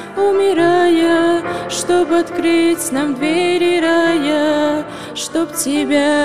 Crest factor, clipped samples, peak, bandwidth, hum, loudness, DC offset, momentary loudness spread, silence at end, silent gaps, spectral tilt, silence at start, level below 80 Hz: 12 dB; under 0.1%; -4 dBFS; 15 kHz; none; -15 LUFS; 0.6%; 7 LU; 0 s; none; -3.5 dB/octave; 0 s; -54 dBFS